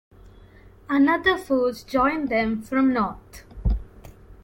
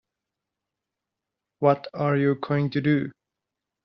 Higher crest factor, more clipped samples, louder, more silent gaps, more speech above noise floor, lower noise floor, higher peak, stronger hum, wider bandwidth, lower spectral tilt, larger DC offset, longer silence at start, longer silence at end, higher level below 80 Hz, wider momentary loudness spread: about the same, 18 dB vs 22 dB; neither; about the same, -23 LUFS vs -24 LUFS; neither; second, 27 dB vs 63 dB; second, -49 dBFS vs -86 dBFS; about the same, -6 dBFS vs -6 dBFS; neither; first, 16.5 kHz vs 5.8 kHz; about the same, -6.5 dB/octave vs -7 dB/octave; neither; second, 0.25 s vs 1.6 s; second, 0.1 s vs 0.75 s; first, -36 dBFS vs -68 dBFS; first, 10 LU vs 3 LU